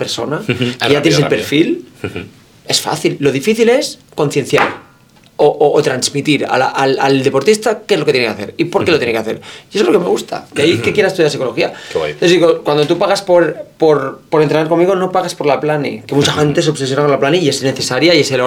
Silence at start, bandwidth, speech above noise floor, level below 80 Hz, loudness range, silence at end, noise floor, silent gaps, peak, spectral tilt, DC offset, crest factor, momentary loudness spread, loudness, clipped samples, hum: 0 s; 17.5 kHz; 33 dB; -52 dBFS; 2 LU; 0 s; -46 dBFS; none; 0 dBFS; -4.5 dB/octave; under 0.1%; 14 dB; 7 LU; -13 LUFS; under 0.1%; none